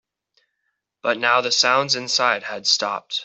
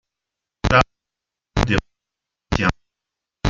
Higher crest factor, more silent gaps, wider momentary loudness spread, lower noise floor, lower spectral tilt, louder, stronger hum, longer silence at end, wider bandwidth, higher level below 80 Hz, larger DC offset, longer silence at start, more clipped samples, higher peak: about the same, 20 dB vs 22 dB; neither; about the same, 8 LU vs 10 LU; second, -76 dBFS vs -86 dBFS; second, -1 dB/octave vs -5.5 dB/octave; about the same, -19 LUFS vs -21 LUFS; neither; about the same, 0 s vs 0 s; about the same, 8.4 kHz vs 7.8 kHz; second, -74 dBFS vs -34 dBFS; neither; first, 1.05 s vs 0.65 s; neither; about the same, -2 dBFS vs 0 dBFS